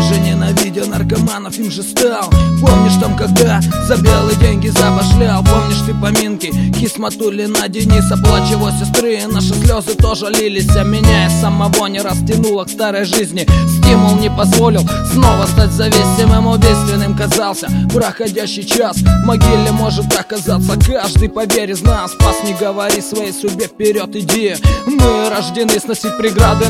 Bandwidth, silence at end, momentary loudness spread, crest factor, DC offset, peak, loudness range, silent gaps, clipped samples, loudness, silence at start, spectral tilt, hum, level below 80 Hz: 16.5 kHz; 0 s; 6 LU; 12 dB; under 0.1%; 0 dBFS; 3 LU; none; 0.2%; -12 LUFS; 0 s; -5 dB/octave; none; -20 dBFS